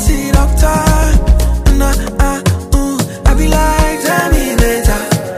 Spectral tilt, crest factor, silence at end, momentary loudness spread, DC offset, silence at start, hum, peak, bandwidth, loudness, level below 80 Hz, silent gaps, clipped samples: -5 dB/octave; 10 dB; 0 s; 4 LU; under 0.1%; 0 s; none; 0 dBFS; 16 kHz; -13 LUFS; -12 dBFS; none; under 0.1%